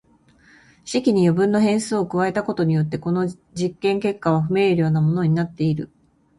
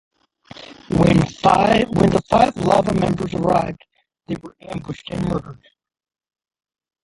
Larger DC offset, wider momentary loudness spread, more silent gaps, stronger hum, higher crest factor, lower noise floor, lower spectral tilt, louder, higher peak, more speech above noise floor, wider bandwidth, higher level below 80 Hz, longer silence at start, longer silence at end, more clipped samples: neither; second, 9 LU vs 16 LU; neither; neither; about the same, 14 dB vs 18 dB; first, -55 dBFS vs -43 dBFS; about the same, -7 dB/octave vs -7 dB/octave; second, -21 LUFS vs -18 LUFS; second, -6 dBFS vs -2 dBFS; first, 35 dB vs 26 dB; about the same, 11.5 kHz vs 11.5 kHz; second, -56 dBFS vs -42 dBFS; first, 0.85 s vs 0.6 s; second, 0.55 s vs 1.5 s; neither